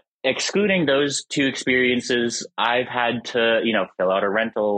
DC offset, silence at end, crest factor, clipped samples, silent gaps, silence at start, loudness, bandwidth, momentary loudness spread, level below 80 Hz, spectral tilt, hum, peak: under 0.1%; 0 s; 16 dB; under 0.1%; none; 0.25 s; -21 LUFS; 9.8 kHz; 4 LU; -62 dBFS; -3.5 dB/octave; none; -4 dBFS